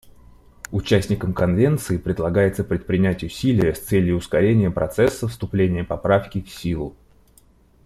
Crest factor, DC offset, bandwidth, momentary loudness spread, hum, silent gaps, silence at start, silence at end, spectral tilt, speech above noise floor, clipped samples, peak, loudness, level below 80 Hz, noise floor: 18 dB; under 0.1%; 15 kHz; 10 LU; none; none; 0.7 s; 0.95 s; -7 dB/octave; 34 dB; under 0.1%; -4 dBFS; -21 LUFS; -42 dBFS; -54 dBFS